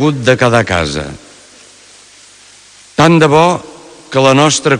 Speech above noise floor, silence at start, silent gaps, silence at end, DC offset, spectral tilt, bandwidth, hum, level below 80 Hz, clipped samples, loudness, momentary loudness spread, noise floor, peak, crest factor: 31 dB; 0 s; none; 0 s; under 0.1%; -5 dB/octave; 12 kHz; none; -42 dBFS; 0.1%; -10 LUFS; 13 LU; -40 dBFS; 0 dBFS; 12 dB